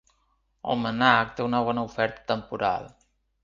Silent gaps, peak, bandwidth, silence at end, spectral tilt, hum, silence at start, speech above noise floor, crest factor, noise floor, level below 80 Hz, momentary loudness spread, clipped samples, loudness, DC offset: none; -2 dBFS; 7.4 kHz; 0.55 s; -6 dB/octave; none; 0.65 s; 45 dB; 24 dB; -70 dBFS; -58 dBFS; 10 LU; under 0.1%; -25 LUFS; under 0.1%